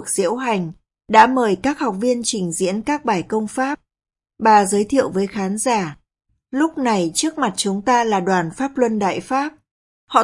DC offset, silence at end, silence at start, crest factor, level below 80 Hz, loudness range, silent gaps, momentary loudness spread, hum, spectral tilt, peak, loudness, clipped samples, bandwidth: under 0.1%; 0 s; 0 s; 18 dB; -56 dBFS; 2 LU; 9.71-10.07 s; 9 LU; none; -4 dB/octave; 0 dBFS; -19 LUFS; under 0.1%; 11.5 kHz